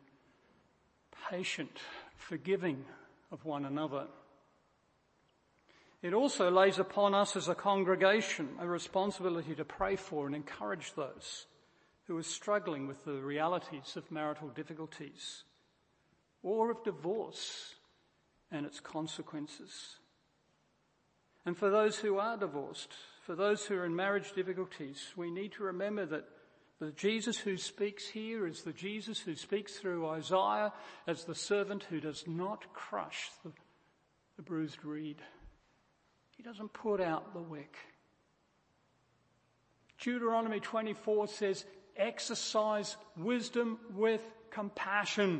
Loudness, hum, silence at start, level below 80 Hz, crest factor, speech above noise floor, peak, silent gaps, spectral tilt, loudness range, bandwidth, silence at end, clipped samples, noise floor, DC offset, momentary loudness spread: -36 LUFS; none; 1.15 s; -74 dBFS; 24 dB; 39 dB; -12 dBFS; none; -4 dB/octave; 11 LU; 8.4 kHz; 0 s; under 0.1%; -75 dBFS; under 0.1%; 15 LU